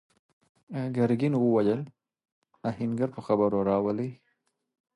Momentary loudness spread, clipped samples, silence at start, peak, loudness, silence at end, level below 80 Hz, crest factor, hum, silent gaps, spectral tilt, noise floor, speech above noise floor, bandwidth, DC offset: 12 LU; under 0.1%; 0.7 s; -12 dBFS; -28 LUFS; 0.8 s; -64 dBFS; 18 dB; none; 2.32-2.42 s; -9.5 dB/octave; -76 dBFS; 49 dB; 11 kHz; under 0.1%